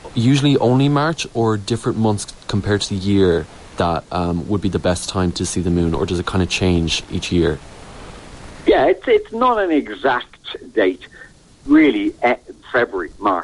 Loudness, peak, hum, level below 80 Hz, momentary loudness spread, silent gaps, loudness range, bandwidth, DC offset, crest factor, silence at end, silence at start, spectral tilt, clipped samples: -18 LUFS; -4 dBFS; none; -36 dBFS; 12 LU; none; 2 LU; 11.5 kHz; under 0.1%; 14 dB; 0 s; 0.05 s; -5.5 dB/octave; under 0.1%